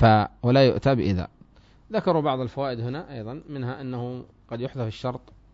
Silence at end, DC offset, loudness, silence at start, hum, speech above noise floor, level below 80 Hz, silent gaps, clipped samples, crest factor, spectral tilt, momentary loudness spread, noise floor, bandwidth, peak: 0.35 s; under 0.1%; -25 LUFS; 0 s; none; 30 dB; -48 dBFS; none; under 0.1%; 20 dB; -8.5 dB/octave; 17 LU; -53 dBFS; 7.6 kHz; -4 dBFS